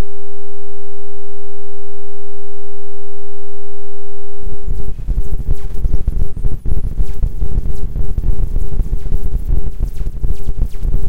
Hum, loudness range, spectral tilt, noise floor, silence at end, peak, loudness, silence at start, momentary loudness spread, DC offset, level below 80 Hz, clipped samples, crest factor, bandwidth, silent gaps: none; 13 LU; -9 dB/octave; -36 dBFS; 0 s; -2 dBFS; -24 LUFS; 0 s; 14 LU; 30%; -18 dBFS; under 0.1%; 8 dB; 2.4 kHz; none